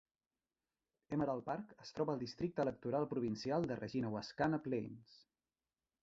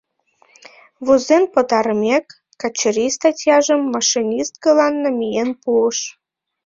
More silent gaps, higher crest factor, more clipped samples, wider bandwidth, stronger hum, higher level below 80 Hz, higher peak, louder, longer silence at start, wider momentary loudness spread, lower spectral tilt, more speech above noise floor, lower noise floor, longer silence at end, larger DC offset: neither; about the same, 18 dB vs 16 dB; neither; about the same, 7.6 kHz vs 7.6 kHz; neither; second, -72 dBFS vs -62 dBFS; second, -22 dBFS vs -2 dBFS; second, -41 LUFS vs -17 LUFS; about the same, 1.1 s vs 1 s; about the same, 7 LU vs 7 LU; first, -6 dB/octave vs -2.5 dB/octave; first, over 50 dB vs 41 dB; first, under -90 dBFS vs -58 dBFS; first, 0.85 s vs 0.55 s; neither